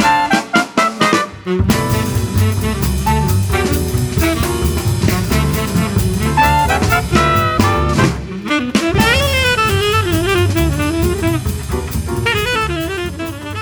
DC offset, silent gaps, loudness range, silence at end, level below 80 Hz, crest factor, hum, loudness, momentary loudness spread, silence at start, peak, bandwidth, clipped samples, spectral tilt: under 0.1%; none; 2 LU; 0 s; -24 dBFS; 14 dB; none; -15 LUFS; 7 LU; 0 s; 0 dBFS; over 20 kHz; under 0.1%; -5 dB/octave